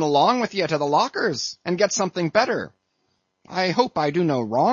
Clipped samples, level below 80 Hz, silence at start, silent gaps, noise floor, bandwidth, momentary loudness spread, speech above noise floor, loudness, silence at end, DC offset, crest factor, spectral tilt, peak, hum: under 0.1%; -66 dBFS; 0 s; none; -71 dBFS; 7.6 kHz; 7 LU; 50 dB; -22 LUFS; 0 s; under 0.1%; 18 dB; -4.5 dB/octave; -4 dBFS; none